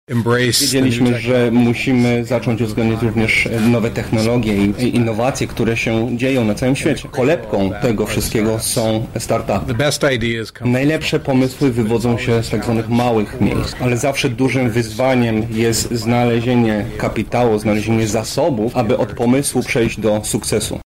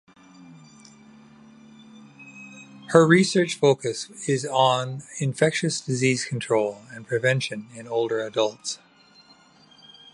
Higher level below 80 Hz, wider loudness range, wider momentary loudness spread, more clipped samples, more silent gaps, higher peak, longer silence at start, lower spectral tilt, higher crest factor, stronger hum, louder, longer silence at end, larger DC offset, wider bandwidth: first, -36 dBFS vs -70 dBFS; second, 2 LU vs 6 LU; second, 4 LU vs 20 LU; neither; neither; about the same, -2 dBFS vs 0 dBFS; second, 0.1 s vs 0.4 s; about the same, -5.5 dB/octave vs -4.5 dB/octave; second, 14 dB vs 24 dB; neither; first, -16 LUFS vs -23 LUFS; second, 0.05 s vs 1.4 s; first, 0.2% vs under 0.1%; first, 16 kHz vs 11.5 kHz